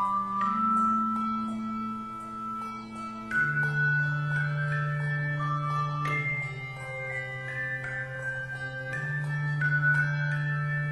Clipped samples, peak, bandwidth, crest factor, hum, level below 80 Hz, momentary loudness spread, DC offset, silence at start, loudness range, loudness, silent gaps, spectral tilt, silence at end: under 0.1%; -16 dBFS; 11 kHz; 14 dB; none; -60 dBFS; 11 LU; under 0.1%; 0 s; 4 LU; -29 LUFS; none; -7 dB/octave; 0 s